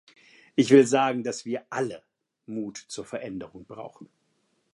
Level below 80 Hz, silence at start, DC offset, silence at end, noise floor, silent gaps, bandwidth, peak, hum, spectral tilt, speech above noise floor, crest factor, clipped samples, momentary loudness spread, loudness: -70 dBFS; 0.55 s; under 0.1%; 0.7 s; -71 dBFS; none; 11.5 kHz; -4 dBFS; none; -5 dB/octave; 46 dB; 22 dB; under 0.1%; 24 LU; -25 LUFS